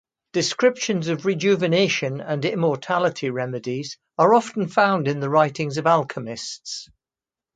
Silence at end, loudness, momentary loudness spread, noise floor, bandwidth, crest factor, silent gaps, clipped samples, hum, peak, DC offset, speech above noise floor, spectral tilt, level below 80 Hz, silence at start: 0.7 s; -22 LUFS; 11 LU; under -90 dBFS; 9.4 kHz; 18 dB; none; under 0.1%; none; -2 dBFS; under 0.1%; over 69 dB; -5 dB/octave; -68 dBFS; 0.35 s